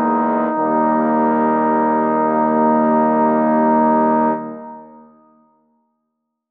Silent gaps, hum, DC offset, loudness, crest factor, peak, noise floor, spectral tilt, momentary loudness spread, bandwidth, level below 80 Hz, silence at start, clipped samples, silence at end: none; none; under 0.1%; -16 LUFS; 14 dB; -4 dBFS; -75 dBFS; -11 dB/octave; 4 LU; 3.5 kHz; -68 dBFS; 0 s; under 0.1%; 1.65 s